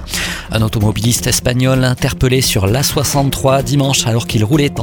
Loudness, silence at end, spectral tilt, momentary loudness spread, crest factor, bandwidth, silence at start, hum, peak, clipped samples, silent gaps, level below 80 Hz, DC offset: -14 LUFS; 0 s; -4.5 dB/octave; 3 LU; 14 dB; 19.5 kHz; 0 s; none; 0 dBFS; under 0.1%; none; -30 dBFS; under 0.1%